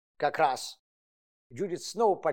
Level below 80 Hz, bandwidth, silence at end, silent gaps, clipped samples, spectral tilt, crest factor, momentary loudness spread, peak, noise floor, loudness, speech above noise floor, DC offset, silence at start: -82 dBFS; 17.5 kHz; 0 s; 0.80-1.50 s; under 0.1%; -4 dB/octave; 18 dB; 13 LU; -12 dBFS; under -90 dBFS; -30 LUFS; over 61 dB; under 0.1%; 0.2 s